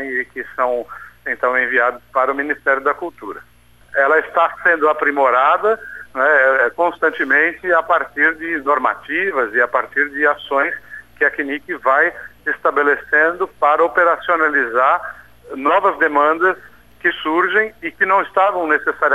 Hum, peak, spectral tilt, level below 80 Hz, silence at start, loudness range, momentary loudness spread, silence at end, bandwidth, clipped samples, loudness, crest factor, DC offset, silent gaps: 60 Hz at -55 dBFS; -4 dBFS; -5 dB/octave; -56 dBFS; 0 s; 3 LU; 9 LU; 0 s; 13.5 kHz; under 0.1%; -16 LUFS; 14 dB; 0.2%; none